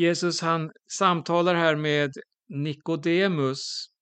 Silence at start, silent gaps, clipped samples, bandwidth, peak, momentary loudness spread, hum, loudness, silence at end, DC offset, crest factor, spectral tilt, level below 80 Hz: 0 s; none; under 0.1%; 9.2 kHz; -6 dBFS; 10 LU; none; -25 LUFS; 0.15 s; under 0.1%; 20 dB; -5 dB/octave; -74 dBFS